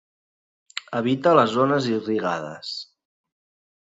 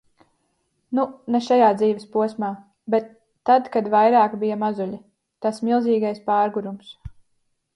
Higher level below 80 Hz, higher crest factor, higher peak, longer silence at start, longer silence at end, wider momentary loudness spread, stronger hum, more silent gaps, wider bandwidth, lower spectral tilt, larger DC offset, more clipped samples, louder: second, -68 dBFS vs -58 dBFS; about the same, 22 dB vs 18 dB; about the same, -4 dBFS vs -4 dBFS; second, 0.75 s vs 0.9 s; first, 1.15 s vs 0.65 s; first, 16 LU vs 13 LU; neither; neither; second, 7.8 kHz vs 11.5 kHz; about the same, -6 dB/octave vs -6.5 dB/octave; neither; neither; about the same, -22 LUFS vs -21 LUFS